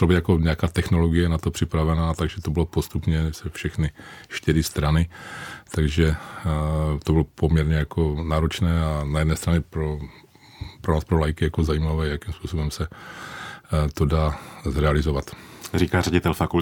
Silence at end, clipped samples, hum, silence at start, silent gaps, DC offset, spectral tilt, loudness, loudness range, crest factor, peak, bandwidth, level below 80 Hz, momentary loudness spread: 0 s; under 0.1%; none; 0 s; none; under 0.1%; -6.5 dB/octave; -24 LUFS; 3 LU; 18 dB; -4 dBFS; 18 kHz; -34 dBFS; 12 LU